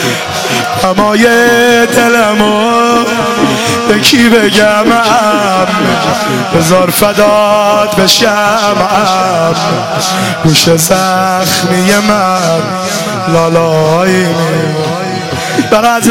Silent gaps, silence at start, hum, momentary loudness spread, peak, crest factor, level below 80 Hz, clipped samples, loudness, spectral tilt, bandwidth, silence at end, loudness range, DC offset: none; 0 s; none; 6 LU; 0 dBFS; 8 dB; -40 dBFS; 0.3%; -8 LUFS; -4 dB/octave; 17.5 kHz; 0 s; 2 LU; 0.7%